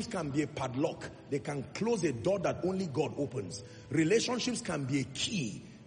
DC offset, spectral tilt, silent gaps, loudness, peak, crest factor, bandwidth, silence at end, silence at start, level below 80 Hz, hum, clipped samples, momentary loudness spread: under 0.1%; -5 dB/octave; none; -33 LUFS; -18 dBFS; 16 dB; 10 kHz; 0 s; 0 s; -64 dBFS; none; under 0.1%; 10 LU